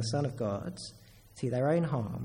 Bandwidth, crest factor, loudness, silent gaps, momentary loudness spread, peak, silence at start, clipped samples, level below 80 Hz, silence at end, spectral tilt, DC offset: 16 kHz; 16 dB; -32 LUFS; none; 14 LU; -16 dBFS; 0 s; under 0.1%; -60 dBFS; 0 s; -6.5 dB/octave; under 0.1%